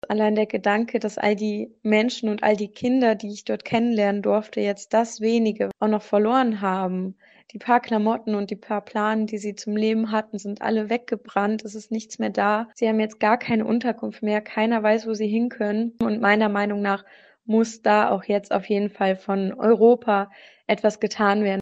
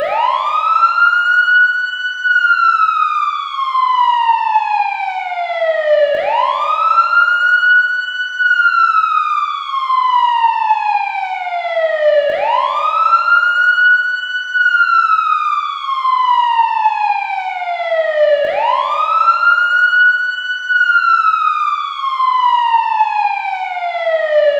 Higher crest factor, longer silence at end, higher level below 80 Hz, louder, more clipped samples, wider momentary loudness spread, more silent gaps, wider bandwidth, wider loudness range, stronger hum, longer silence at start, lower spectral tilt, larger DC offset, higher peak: first, 20 dB vs 12 dB; about the same, 0 s vs 0 s; about the same, -68 dBFS vs -70 dBFS; second, -23 LUFS vs -13 LUFS; neither; about the same, 8 LU vs 8 LU; neither; about the same, 8.2 kHz vs 8 kHz; about the same, 4 LU vs 3 LU; neither; about the same, 0.1 s vs 0 s; first, -6 dB/octave vs 0 dB/octave; neither; about the same, -4 dBFS vs -2 dBFS